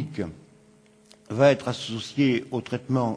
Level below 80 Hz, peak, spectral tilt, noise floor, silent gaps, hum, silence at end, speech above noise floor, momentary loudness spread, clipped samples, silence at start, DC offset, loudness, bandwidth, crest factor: -62 dBFS; -4 dBFS; -6.5 dB/octave; -56 dBFS; none; none; 0 s; 32 dB; 14 LU; under 0.1%; 0 s; under 0.1%; -25 LUFS; 11 kHz; 22 dB